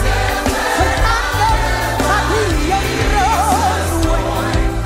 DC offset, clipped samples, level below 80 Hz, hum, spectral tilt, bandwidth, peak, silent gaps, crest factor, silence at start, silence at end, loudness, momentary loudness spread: under 0.1%; under 0.1%; -20 dBFS; none; -4.5 dB/octave; 16.5 kHz; -2 dBFS; none; 14 dB; 0 s; 0 s; -15 LUFS; 3 LU